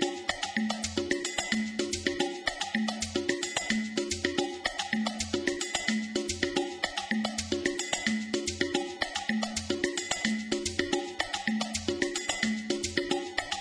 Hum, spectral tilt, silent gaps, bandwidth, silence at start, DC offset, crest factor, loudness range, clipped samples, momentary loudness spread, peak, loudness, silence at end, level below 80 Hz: none; -2.5 dB/octave; none; 11 kHz; 0 s; under 0.1%; 20 dB; 0 LU; under 0.1%; 2 LU; -10 dBFS; -31 LUFS; 0 s; -56 dBFS